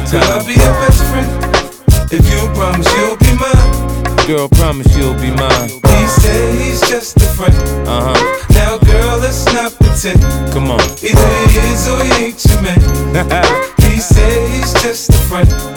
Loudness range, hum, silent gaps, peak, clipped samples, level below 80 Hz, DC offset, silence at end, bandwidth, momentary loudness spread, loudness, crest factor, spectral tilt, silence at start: 1 LU; none; none; 0 dBFS; 0.2%; -14 dBFS; under 0.1%; 0 s; over 20 kHz; 4 LU; -11 LUFS; 10 dB; -5 dB/octave; 0 s